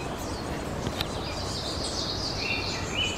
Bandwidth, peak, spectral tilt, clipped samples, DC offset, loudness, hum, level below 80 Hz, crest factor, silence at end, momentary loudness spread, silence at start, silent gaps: 16 kHz; -10 dBFS; -3.5 dB/octave; under 0.1%; 0.2%; -30 LUFS; none; -42 dBFS; 22 dB; 0 s; 5 LU; 0 s; none